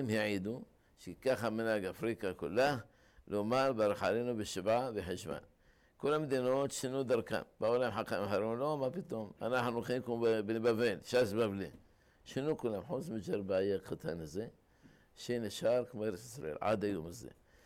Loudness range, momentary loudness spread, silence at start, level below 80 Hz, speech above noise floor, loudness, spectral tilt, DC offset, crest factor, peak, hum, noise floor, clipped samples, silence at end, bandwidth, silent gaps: 4 LU; 11 LU; 0 s; -66 dBFS; 32 dB; -36 LUFS; -5.5 dB/octave; under 0.1%; 12 dB; -24 dBFS; none; -67 dBFS; under 0.1%; 0.35 s; 16.5 kHz; none